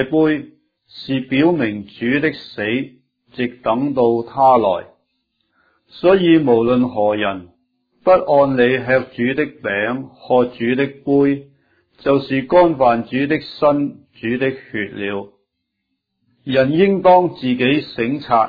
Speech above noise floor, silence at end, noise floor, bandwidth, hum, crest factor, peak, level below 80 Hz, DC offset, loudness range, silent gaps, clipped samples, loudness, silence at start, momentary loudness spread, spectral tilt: 58 dB; 0 s; -74 dBFS; 5 kHz; none; 16 dB; 0 dBFS; -52 dBFS; under 0.1%; 5 LU; none; under 0.1%; -17 LUFS; 0 s; 12 LU; -9 dB/octave